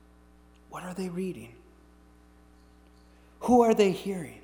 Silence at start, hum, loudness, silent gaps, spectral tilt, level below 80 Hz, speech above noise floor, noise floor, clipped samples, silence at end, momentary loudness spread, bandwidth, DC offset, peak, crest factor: 0.7 s; 60 Hz at -60 dBFS; -27 LUFS; none; -6 dB/octave; -58 dBFS; 31 dB; -57 dBFS; under 0.1%; 0.05 s; 23 LU; 20 kHz; under 0.1%; -8 dBFS; 22 dB